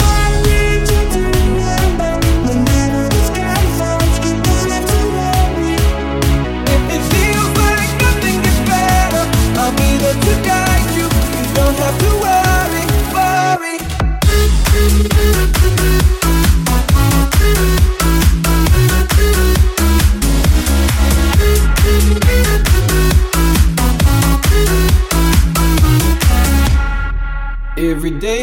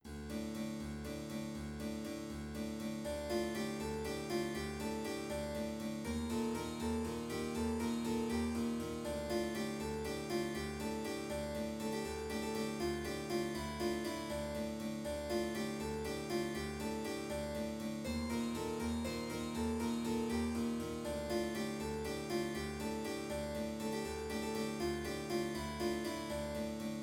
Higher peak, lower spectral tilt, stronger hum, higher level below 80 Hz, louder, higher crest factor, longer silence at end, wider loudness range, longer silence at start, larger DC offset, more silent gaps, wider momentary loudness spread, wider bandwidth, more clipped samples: first, 0 dBFS vs -26 dBFS; about the same, -5 dB/octave vs -5 dB/octave; neither; first, -14 dBFS vs -56 dBFS; first, -13 LUFS vs -40 LUFS; about the same, 12 dB vs 14 dB; about the same, 0 s vs 0 s; about the same, 2 LU vs 2 LU; about the same, 0 s vs 0.05 s; neither; neither; about the same, 3 LU vs 4 LU; about the same, 17 kHz vs 17.5 kHz; neither